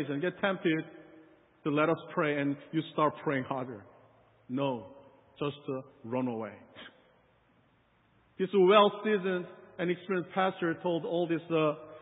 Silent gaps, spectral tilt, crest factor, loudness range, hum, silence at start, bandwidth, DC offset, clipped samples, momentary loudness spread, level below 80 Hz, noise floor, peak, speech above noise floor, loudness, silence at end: none; -3 dB/octave; 24 dB; 10 LU; none; 0 s; 3.9 kHz; under 0.1%; under 0.1%; 16 LU; -78 dBFS; -68 dBFS; -8 dBFS; 37 dB; -31 LUFS; 0 s